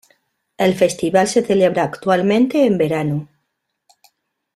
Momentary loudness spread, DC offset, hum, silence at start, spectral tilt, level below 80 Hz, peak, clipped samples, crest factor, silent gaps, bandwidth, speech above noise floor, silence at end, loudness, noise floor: 5 LU; under 0.1%; none; 0.6 s; -5.5 dB/octave; -58 dBFS; -2 dBFS; under 0.1%; 16 dB; none; 14 kHz; 58 dB; 1.3 s; -17 LUFS; -74 dBFS